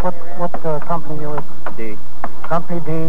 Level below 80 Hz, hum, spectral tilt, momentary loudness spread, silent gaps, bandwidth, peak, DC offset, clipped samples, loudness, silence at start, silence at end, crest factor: -46 dBFS; none; -8 dB/octave; 9 LU; none; 16 kHz; -2 dBFS; 50%; under 0.1%; -26 LUFS; 0 s; 0 s; 16 dB